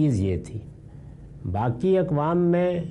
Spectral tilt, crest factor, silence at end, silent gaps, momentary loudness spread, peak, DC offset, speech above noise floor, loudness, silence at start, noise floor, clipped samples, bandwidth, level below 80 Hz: -9 dB/octave; 12 dB; 0 s; none; 23 LU; -12 dBFS; under 0.1%; 20 dB; -24 LUFS; 0 s; -43 dBFS; under 0.1%; 10.5 kHz; -48 dBFS